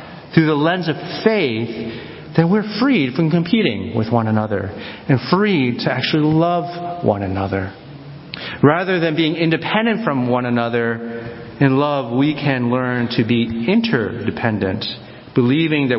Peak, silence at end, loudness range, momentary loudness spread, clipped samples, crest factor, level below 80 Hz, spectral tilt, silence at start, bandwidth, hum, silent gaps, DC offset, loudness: 0 dBFS; 0 s; 1 LU; 11 LU; under 0.1%; 18 dB; -48 dBFS; -11 dB/octave; 0 s; 5.8 kHz; none; none; under 0.1%; -18 LUFS